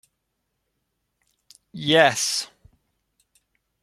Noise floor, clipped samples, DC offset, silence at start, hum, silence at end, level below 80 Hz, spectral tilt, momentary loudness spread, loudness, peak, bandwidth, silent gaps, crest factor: -77 dBFS; under 0.1%; under 0.1%; 1.75 s; none; 1.4 s; -66 dBFS; -2.5 dB/octave; 21 LU; -20 LUFS; -2 dBFS; 15.5 kHz; none; 26 dB